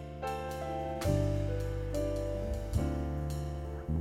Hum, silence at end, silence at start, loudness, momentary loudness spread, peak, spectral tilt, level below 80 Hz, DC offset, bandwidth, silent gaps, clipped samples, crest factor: none; 0 s; 0 s; -35 LUFS; 7 LU; -16 dBFS; -7 dB/octave; -40 dBFS; under 0.1%; 16 kHz; none; under 0.1%; 18 dB